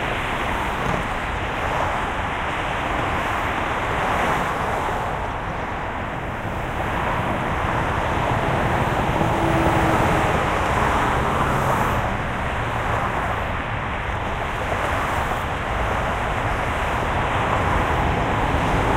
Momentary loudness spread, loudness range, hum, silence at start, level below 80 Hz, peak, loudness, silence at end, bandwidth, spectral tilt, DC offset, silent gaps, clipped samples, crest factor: 6 LU; 4 LU; none; 0 s; -32 dBFS; -4 dBFS; -22 LUFS; 0 s; 16 kHz; -5.5 dB/octave; under 0.1%; none; under 0.1%; 18 dB